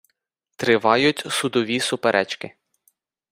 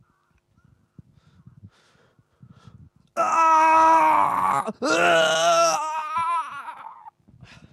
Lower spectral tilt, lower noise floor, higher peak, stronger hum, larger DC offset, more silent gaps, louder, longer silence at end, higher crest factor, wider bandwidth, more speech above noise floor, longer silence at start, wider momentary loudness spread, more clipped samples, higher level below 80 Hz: first, -3.5 dB/octave vs -2 dB/octave; first, -75 dBFS vs -66 dBFS; first, -2 dBFS vs -8 dBFS; neither; neither; neither; about the same, -20 LUFS vs -19 LUFS; first, 0.85 s vs 0.65 s; about the same, 20 dB vs 16 dB; first, 16 kHz vs 14 kHz; first, 54 dB vs 46 dB; second, 0.6 s vs 1.65 s; second, 11 LU vs 18 LU; neither; about the same, -64 dBFS vs -68 dBFS